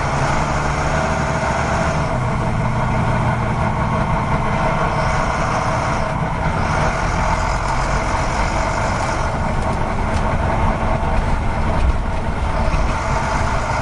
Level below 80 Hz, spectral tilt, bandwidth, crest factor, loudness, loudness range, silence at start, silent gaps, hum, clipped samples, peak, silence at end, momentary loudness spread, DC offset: -24 dBFS; -6 dB/octave; 11.5 kHz; 14 dB; -19 LUFS; 1 LU; 0 s; none; none; under 0.1%; -4 dBFS; 0 s; 2 LU; under 0.1%